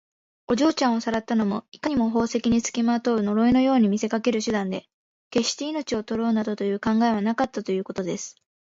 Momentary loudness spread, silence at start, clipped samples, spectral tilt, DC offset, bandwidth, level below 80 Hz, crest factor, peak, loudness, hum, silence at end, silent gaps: 9 LU; 0.5 s; under 0.1%; -5 dB/octave; under 0.1%; 7.8 kHz; -54 dBFS; 14 dB; -8 dBFS; -24 LUFS; none; 0.45 s; 1.68-1.72 s, 4.94-5.31 s